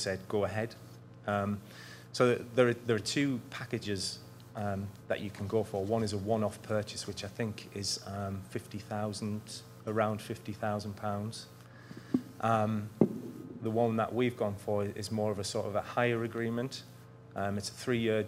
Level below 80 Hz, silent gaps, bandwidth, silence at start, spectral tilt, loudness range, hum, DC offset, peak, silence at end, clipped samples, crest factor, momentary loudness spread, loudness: -68 dBFS; none; 16 kHz; 0 s; -5.5 dB/octave; 4 LU; none; under 0.1%; -10 dBFS; 0 s; under 0.1%; 24 dB; 13 LU; -34 LUFS